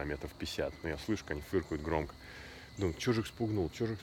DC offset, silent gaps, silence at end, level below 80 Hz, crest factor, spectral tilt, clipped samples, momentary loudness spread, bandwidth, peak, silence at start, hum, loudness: under 0.1%; none; 0 s; -52 dBFS; 18 dB; -6 dB/octave; under 0.1%; 12 LU; 18 kHz; -18 dBFS; 0 s; none; -37 LUFS